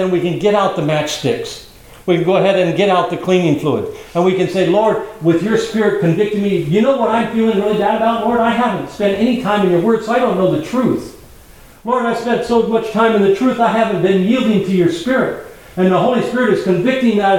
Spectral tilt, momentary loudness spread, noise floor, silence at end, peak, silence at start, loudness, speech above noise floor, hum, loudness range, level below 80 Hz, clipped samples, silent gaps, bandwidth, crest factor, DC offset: -6.5 dB/octave; 5 LU; -41 dBFS; 0 s; 0 dBFS; 0 s; -15 LUFS; 27 dB; none; 2 LU; -48 dBFS; under 0.1%; none; 17 kHz; 14 dB; 0.2%